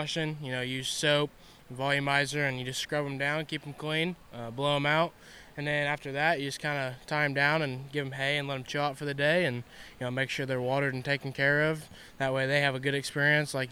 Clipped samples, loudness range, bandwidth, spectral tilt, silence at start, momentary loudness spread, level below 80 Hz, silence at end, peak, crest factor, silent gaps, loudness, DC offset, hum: under 0.1%; 2 LU; 16 kHz; -4.5 dB/octave; 0 s; 9 LU; -62 dBFS; 0 s; -10 dBFS; 20 dB; none; -29 LUFS; under 0.1%; none